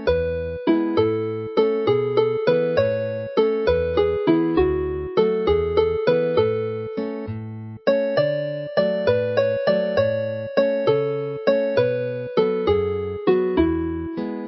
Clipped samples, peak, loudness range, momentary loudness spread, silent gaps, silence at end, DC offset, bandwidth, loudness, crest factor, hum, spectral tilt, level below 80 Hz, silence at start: under 0.1%; -4 dBFS; 2 LU; 6 LU; none; 0 s; under 0.1%; 6 kHz; -21 LUFS; 16 dB; none; -9 dB/octave; -40 dBFS; 0 s